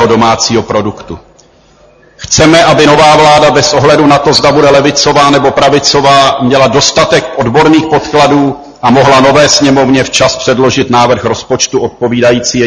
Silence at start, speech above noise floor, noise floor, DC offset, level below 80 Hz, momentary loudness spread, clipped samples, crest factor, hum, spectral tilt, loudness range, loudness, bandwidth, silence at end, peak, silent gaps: 0 s; 36 dB; -42 dBFS; under 0.1%; -34 dBFS; 8 LU; 3%; 6 dB; none; -4 dB/octave; 2 LU; -6 LUFS; 12 kHz; 0 s; 0 dBFS; none